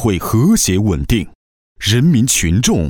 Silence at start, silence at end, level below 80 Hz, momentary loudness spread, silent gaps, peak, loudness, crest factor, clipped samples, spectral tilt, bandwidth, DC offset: 0 s; 0 s; -28 dBFS; 7 LU; 1.35-1.76 s; 0 dBFS; -14 LUFS; 14 dB; under 0.1%; -4.5 dB/octave; 19 kHz; under 0.1%